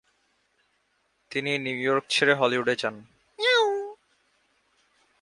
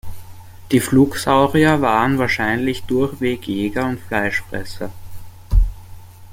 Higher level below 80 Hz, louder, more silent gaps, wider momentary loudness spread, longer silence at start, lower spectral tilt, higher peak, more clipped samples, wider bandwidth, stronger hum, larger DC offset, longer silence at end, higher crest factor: second, -74 dBFS vs -28 dBFS; second, -25 LUFS vs -18 LUFS; neither; about the same, 12 LU vs 14 LU; first, 1.3 s vs 0.05 s; second, -3.5 dB/octave vs -6 dB/octave; second, -6 dBFS vs -2 dBFS; neither; second, 11.5 kHz vs 16.5 kHz; neither; neither; first, 1.3 s vs 0 s; first, 22 dB vs 16 dB